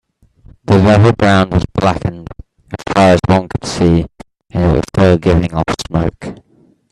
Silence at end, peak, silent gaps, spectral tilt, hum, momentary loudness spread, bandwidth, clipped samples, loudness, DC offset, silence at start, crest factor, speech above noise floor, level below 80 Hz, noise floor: 0.55 s; 0 dBFS; none; -7 dB/octave; none; 19 LU; 11.5 kHz; under 0.1%; -13 LUFS; under 0.1%; 0.7 s; 14 dB; 40 dB; -32 dBFS; -51 dBFS